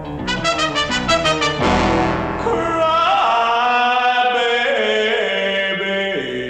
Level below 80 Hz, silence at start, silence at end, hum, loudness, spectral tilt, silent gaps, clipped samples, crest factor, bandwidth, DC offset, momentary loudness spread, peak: -38 dBFS; 0 s; 0 s; none; -17 LUFS; -4 dB/octave; none; under 0.1%; 14 dB; 11.5 kHz; under 0.1%; 5 LU; -4 dBFS